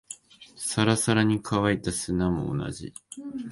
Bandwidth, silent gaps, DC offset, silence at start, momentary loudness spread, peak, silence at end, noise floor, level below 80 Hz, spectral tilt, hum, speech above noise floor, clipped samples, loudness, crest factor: 12 kHz; none; under 0.1%; 0.1 s; 18 LU; -8 dBFS; 0 s; -49 dBFS; -48 dBFS; -5 dB/octave; none; 23 dB; under 0.1%; -26 LUFS; 20 dB